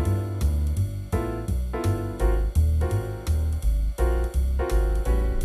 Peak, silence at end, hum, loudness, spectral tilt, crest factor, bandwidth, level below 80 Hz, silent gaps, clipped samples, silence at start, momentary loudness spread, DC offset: -10 dBFS; 0 s; none; -26 LUFS; -7.5 dB/octave; 12 dB; 13 kHz; -24 dBFS; none; under 0.1%; 0 s; 5 LU; under 0.1%